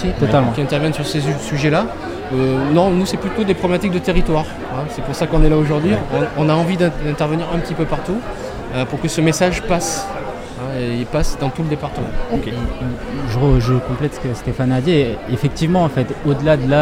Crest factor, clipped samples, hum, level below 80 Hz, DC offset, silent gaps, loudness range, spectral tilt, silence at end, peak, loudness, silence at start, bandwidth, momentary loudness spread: 16 dB; under 0.1%; none; -26 dBFS; under 0.1%; none; 3 LU; -6 dB/octave; 0 s; 0 dBFS; -18 LUFS; 0 s; 16 kHz; 9 LU